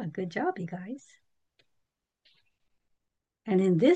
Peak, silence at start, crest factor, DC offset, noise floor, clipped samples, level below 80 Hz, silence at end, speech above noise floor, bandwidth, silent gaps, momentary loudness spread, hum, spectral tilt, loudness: -12 dBFS; 0 s; 20 dB; under 0.1%; -84 dBFS; under 0.1%; -80 dBFS; 0 s; 57 dB; 8.6 kHz; none; 19 LU; none; -8 dB/octave; -29 LUFS